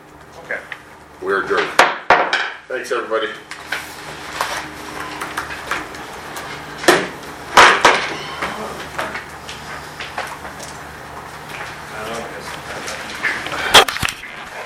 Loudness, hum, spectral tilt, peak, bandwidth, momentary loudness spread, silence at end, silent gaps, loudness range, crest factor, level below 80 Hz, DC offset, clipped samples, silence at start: -18 LUFS; none; -2 dB/octave; 0 dBFS; 17 kHz; 20 LU; 0 s; none; 13 LU; 20 dB; -48 dBFS; under 0.1%; under 0.1%; 0 s